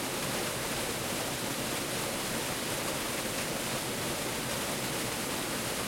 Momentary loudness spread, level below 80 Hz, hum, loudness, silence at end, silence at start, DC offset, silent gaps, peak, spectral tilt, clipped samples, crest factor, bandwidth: 0 LU; -56 dBFS; none; -32 LUFS; 0 s; 0 s; under 0.1%; none; -20 dBFS; -2.5 dB/octave; under 0.1%; 14 dB; 16.5 kHz